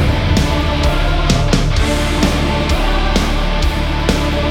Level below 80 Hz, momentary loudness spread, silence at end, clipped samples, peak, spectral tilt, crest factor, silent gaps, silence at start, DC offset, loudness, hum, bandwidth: -16 dBFS; 3 LU; 0 s; under 0.1%; 0 dBFS; -5 dB/octave; 14 dB; none; 0 s; under 0.1%; -16 LUFS; none; 16 kHz